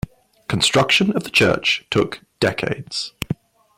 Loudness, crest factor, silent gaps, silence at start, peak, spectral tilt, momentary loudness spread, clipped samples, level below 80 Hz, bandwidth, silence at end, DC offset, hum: -19 LUFS; 16 dB; none; 0.5 s; -4 dBFS; -4 dB/octave; 13 LU; under 0.1%; -48 dBFS; 16.5 kHz; 0.45 s; under 0.1%; none